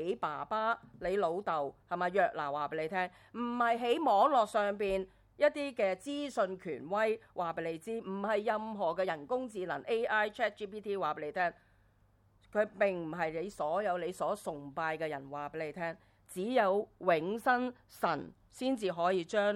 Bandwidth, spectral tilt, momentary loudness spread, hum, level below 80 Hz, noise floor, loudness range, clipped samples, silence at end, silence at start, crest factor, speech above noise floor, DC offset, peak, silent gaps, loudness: 15.5 kHz; -5 dB/octave; 9 LU; none; -68 dBFS; -68 dBFS; 5 LU; under 0.1%; 0 s; 0 s; 18 dB; 34 dB; under 0.1%; -16 dBFS; none; -34 LUFS